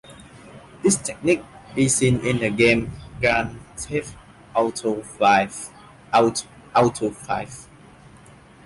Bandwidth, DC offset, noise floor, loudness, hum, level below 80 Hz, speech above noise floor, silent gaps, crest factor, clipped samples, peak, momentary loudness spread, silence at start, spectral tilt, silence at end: 11.5 kHz; under 0.1%; -48 dBFS; -21 LUFS; none; -48 dBFS; 27 dB; none; 18 dB; under 0.1%; -4 dBFS; 15 LU; 0.1 s; -4.5 dB/octave; 1 s